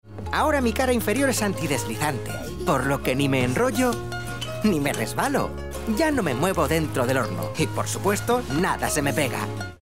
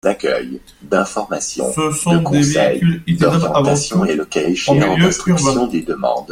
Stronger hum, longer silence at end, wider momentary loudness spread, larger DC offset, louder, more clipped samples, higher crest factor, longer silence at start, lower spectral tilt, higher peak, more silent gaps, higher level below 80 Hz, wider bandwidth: neither; about the same, 0 s vs 0 s; about the same, 7 LU vs 6 LU; first, 0.8% vs under 0.1%; second, -24 LUFS vs -16 LUFS; neither; about the same, 16 dB vs 14 dB; about the same, 0 s vs 0.05 s; about the same, -5 dB/octave vs -5 dB/octave; second, -8 dBFS vs 0 dBFS; neither; about the same, -40 dBFS vs -44 dBFS; about the same, 16 kHz vs 15.5 kHz